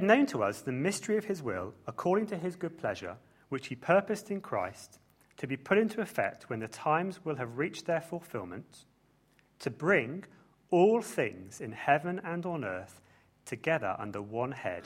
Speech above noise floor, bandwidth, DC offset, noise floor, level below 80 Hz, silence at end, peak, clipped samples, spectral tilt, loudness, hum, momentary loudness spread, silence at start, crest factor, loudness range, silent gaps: 35 dB; 16 kHz; under 0.1%; -67 dBFS; -72 dBFS; 0 s; -8 dBFS; under 0.1%; -5.5 dB/octave; -32 LUFS; none; 13 LU; 0 s; 24 dB; 4 LU; none